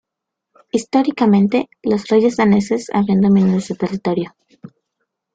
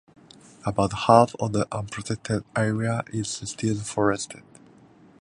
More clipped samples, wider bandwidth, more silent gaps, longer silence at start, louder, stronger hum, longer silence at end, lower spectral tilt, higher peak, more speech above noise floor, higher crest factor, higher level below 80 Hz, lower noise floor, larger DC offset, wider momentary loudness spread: neither; second, 9 kHz vs 11.5 kHz; neither; about the same, 0.75 s vs 0.65 s; first, -16 LUFS vs -25 LUFS; neither; second, 0.65 s vs 0.8 s; first, -7 dB/octave vs -5.5 dB/octave; about the same, -4 dBFS vs -2 dBFS; first, 65 dB vs 29 dB; second, 14 dB vs 24 dB; about the same, -56 dBFS vs -54 dBFS; first, -81 dBFS vs -53 dBFS; neither; second, 9 LU vs 13 LU